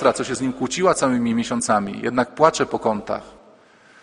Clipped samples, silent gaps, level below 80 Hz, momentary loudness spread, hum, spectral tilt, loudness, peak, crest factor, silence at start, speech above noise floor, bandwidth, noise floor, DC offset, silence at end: under 0.1%; none; -54 dBFS; 7 LU; none; -4.5 dB/octave; -21 LUFS; 0 dBFS; 20 dB; 0 s; 30 dB; 10.5 kHz; -51 dBFS; under 0.1%; 0.7 s